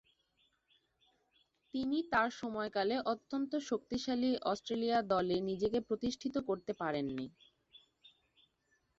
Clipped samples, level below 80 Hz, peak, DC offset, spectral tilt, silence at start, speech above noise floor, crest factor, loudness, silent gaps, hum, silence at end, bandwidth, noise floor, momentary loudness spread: under 0.1%; -68 dBFS; -18 dBFS; under 0.1%; -3.5 dB/octave; 1.75 s; 42 dB; 20 dB; -36 LUFS; none; none; 1.2 s; 7.8 kHz; -78 dBFS; 6 LU